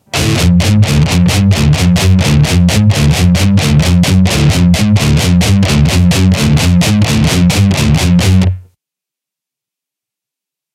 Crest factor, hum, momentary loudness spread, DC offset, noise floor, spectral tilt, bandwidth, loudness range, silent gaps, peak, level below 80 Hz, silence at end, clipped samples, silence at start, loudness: 10 dB; none; 1 LU; under 0.1%; -84 dBFS; -5.5 dB/octave; 16 kHz; 3 LU; none; 0 dBFS; -22 dBFS; 2.15 s; under 0.1%; 0.15 s; -9 LUFS